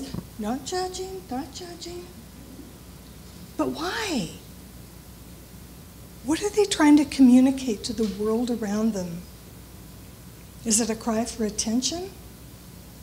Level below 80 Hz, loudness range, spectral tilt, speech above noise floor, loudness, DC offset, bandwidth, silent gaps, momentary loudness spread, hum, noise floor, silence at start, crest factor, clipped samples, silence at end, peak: -48 dBFS; 12 LU; -4 dB/octave; 21 dB; -24 LUFS; under 0.1%; 16.5 kHz; none; 26 LU; none; -44 dBFS; 0 s; 20 dB; under 0.1%; 0 s; -6 dBFS